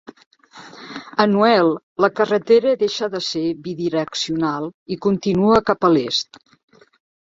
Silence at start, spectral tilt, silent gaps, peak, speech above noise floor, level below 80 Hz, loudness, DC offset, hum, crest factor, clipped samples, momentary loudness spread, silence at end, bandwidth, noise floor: 0.55 s; -5.5 dB/octave; 1.83-1.96 s, 4.74-4.86 s; 0 dBFS; 24 dB; -56 dBFS; -19 LUFS; under 0.1%; none; 18 dB; under 0.1%; 11 LU; 1.15 s; 7.8 kHz; -42 dBFS